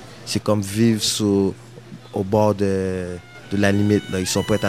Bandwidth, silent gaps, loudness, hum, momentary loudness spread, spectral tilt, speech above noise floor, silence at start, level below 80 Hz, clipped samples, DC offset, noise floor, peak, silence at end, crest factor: 15.5 kHz; none; -20 LUFS; none; 14 LU; -5 dB/octave; 20 dB; 0 s; -52 dBFS; under 0.1%; 0.2%; -40 dBFS; -2 dBFS; 0 s; 20 dB